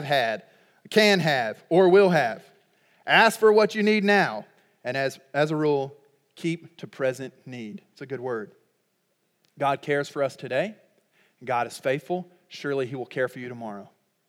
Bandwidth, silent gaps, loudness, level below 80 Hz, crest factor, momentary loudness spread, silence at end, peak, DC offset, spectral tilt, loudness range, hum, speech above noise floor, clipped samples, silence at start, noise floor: 16 kHz; none; -24 LUFS; -86 dBFS; 22 dB; 20 LU; 0.45 s; -4 dBFS; under 0.1%; -5 dB/octave; 12 LU; none; 49 dB; under 0.1%; 0 s; -72 dBFS